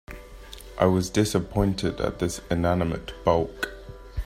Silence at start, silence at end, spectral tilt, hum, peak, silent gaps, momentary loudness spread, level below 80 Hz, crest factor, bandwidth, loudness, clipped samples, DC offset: 0.1 s; 0 s; -6 dB/octave; none; -6 dBFS; none; 20 LU; -40 dBFS; 20 dB; 16 kHz; -25 LUFS; under 0.1%; under 0.1%